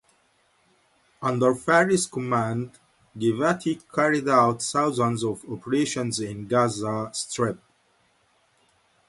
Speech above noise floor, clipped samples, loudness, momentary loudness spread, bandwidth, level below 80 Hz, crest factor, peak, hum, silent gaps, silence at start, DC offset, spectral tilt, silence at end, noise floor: 41 dB; under 0.1%; -24 LUFS; 10 LU; 11.5 kHz; -64 dBFS; 20 dB; -6 dBFS; none; none; 1.2 s; under 0.1%; -5 dB/octave; 1.55 s; -65 dBFS